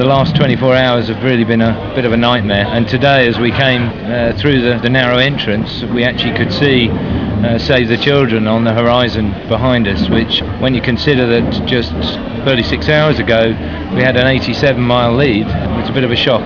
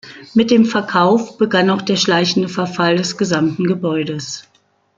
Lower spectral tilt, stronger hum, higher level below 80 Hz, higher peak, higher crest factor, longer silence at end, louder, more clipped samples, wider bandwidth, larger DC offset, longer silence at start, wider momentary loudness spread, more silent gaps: first, -7.5 dB/octave vs -5 dB/octave; neither; first, -30 dBFS vs -58 dBFS; about the same, 0 dBFS vs -2 dBFS; about the same, 12 dB vs 14 dB; second, 0 s vs 0.55 s; first, -12 LUFS vs -16 LUFS; first, 0.5% vs under 0.1%; second, 5.4 kHz vs 7.6 kHz; first, 0.4% vs under 0.1%; about the same, 0 s vs 0.05 s; about the same, 6 LU vs 7 LU; neither